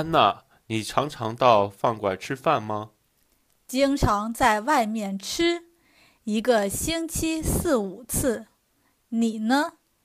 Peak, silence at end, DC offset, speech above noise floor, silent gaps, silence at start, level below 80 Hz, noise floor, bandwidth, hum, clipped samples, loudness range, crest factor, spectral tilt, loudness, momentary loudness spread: -4 dBFS; 0.35 s; under 0.1%; 44 dB; none; 0 s; -42 dBFS; -68 dBFS; 15.5 kHz; none; under 0.1%; 2 LU; 22 dB; -4.5 dB/octave; -24 LUFS; 11 LU